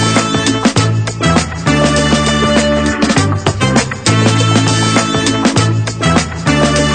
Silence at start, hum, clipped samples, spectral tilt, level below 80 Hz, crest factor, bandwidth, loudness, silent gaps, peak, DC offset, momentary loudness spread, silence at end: 0 s; none; under 0.1%; -4.5 dB/octave; -28 dBFS; 12 dB; 9.4 kHz; -12 LUFS; none; 0 dBFS; under 0.1%; 3 LU; 0 s